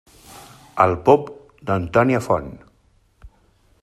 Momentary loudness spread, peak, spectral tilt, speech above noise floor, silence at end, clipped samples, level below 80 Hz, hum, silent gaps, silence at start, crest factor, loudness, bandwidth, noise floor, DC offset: 18 LU; -2 dBFS; -7.5 dB/octave; 41 dB; 0.55 s; under 0.1%; -50 dBFS; none; none; 0.35 s; 20 dB; -19 LUFS; 14 kHz; -59 dBFS; under 0.1%